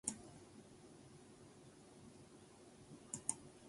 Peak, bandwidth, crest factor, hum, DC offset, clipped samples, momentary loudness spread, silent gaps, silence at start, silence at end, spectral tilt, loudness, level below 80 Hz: -20 dBFS; 11.5 kHz; 34 dB; none; under 0.1%; under 0.1%; 18 LU; none; 0.05 s; 0 s; -3 dB/octave; -52 LUFS; -76 dBFS